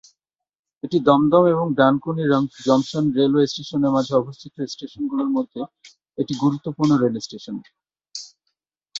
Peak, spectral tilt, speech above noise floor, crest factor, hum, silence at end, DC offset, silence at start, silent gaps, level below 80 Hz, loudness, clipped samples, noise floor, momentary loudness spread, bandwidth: -2 dBFS; -6.5 dB/octave; 57 dB; 18 dB; none; 0 s; under 0.1%; 0.85 s; none; -62 dBFS; -20 LUFS; under 0.1%; -77 dBFS; 18 LU; 7.8 kHz